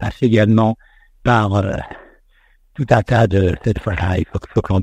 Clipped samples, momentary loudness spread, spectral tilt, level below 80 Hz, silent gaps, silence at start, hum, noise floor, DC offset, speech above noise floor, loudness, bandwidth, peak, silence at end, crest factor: under 0.1%; 11 LU; -8 dB/octave; -34 dBFS; none; 0 s; none; -53 dBFS; under 0.1%; 38 dB; -17 LUFS; 8.6 kHz; 0 dBFS; 0 s; 16 dB